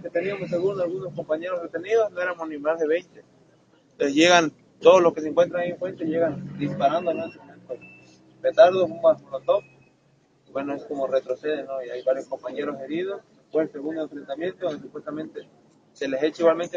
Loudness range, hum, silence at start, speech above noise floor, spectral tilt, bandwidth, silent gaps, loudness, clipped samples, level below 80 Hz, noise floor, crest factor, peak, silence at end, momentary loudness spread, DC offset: 9 LU; none; 0 s; 38 dB; -4.5 dB/octave; 7.8 kHz; none; -24 LUFS; under 0.1%; -70 dBFS; -62 dBFS; 22 dB; -2 dBFS; 0 s; 16 LU; under 0.1%